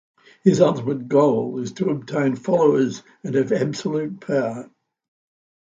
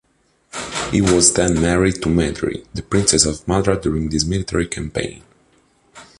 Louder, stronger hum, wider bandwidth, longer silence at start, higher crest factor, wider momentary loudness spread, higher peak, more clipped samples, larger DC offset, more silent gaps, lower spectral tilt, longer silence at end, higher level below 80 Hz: second, -21 LUFS vs -17 LUFS; neither; second, 7.8 kHz vs 11.5 kHz; about the same, 0.45 s vs 0.55 s; about the same, 20 dB vs 20 dB; second, 9 LU vs 13 LU; about the same, -2 dBFS vs 0 dBFS; neither; neither; neither; first, -7 dB/octave vs -4 dB/octave; first, 1.05 s vs 0.15 s; second, -64 dBFS vs -34 dBFS